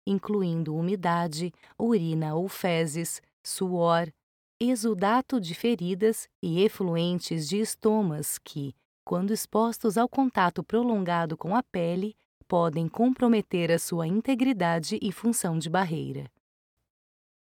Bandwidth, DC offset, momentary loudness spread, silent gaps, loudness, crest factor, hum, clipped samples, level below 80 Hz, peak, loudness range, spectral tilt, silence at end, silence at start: 19 kHz; under 0.1%; 8 LU; 3.33-3.44 s, 4.23-4.60 s, 6.35-6.43 s, 8.85-9.07 s, 12.25-12.41 s; -27 LUFS; 16 dB; none; under 0.1%; -68 dBFS; -10 dBFS; 2 LU; -5.5 dB/octave; 1.25 s; 0.05 s